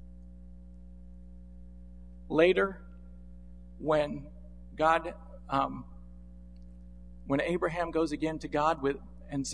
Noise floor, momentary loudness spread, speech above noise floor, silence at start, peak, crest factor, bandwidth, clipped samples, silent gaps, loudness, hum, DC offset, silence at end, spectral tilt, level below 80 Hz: -49 dBFS; 25 LU; 20 dB; 0 s; -10 dBFS; 24 dB; 10.5 kHz; under 0.1%; none; -30 LUFS; 60 Hz at -50 dBFS; 0.2%; 0 s; -5.5 dB/octave; -50 dBFS